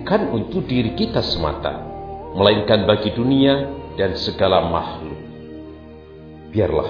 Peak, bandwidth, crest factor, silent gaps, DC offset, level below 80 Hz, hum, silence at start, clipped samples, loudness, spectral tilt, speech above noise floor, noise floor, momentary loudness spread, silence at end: 0 dBFS; 5.4 kHz; 20 dB; none; under 0.1%; -38 dBFS; none; 0 s; under 0.1%; -19 LUFS; -7.5 dB/octave; 21 dB; -39 dBFS; 20 LU; 0 s